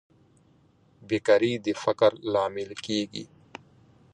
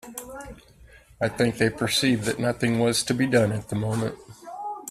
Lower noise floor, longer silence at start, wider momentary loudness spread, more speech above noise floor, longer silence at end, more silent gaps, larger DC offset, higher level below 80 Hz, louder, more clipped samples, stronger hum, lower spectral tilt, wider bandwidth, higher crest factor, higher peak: first, -61 dBFS vs -52 dBFS; first, 1.1 s vs 0.05 s; first, 23 LU vs 18 LU; first, 36 dB vs 28 dB; first, 0.9 s vs 0 s; neither; neither; second, -66 dBFS vs -54 dBFS; about the same, -26 LUFS vs -24 LUFS; neither; neither; about the same, -5 dB/octave vs -4.5 dB/octave; second, 10 kHz vs 15 kHz; about the same, 20 dB vs 20 dB; about the same, -8 dBFS vs -6 dBFS